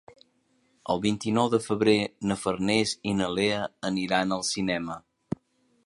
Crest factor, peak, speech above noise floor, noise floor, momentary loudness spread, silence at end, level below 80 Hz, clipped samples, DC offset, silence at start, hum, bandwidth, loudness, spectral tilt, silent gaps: 20 dB; -8 dBFS; 42 dB; -68 dBFS; 14 LU; 0.85 s; -58 dBFS; under 0.1%; under 0.1%; 0.1 s; none; 11.5 kHz; -27 LUFS; -4.5 dB/octave; none